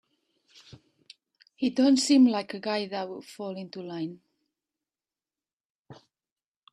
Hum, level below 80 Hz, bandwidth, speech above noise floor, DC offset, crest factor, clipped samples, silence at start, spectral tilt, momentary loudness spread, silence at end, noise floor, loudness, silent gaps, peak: none; -78 dBFS; 11 kHz; over 64 dB; under 0.1%; 20 dB; under 0.1%; 1.6 s; -4 dB/octave; 18 LU; 0.8 s; under -90 dBFS; -27 LUFS; 5.53-5.57 s, 5.65-5.85 s; -10 dBFS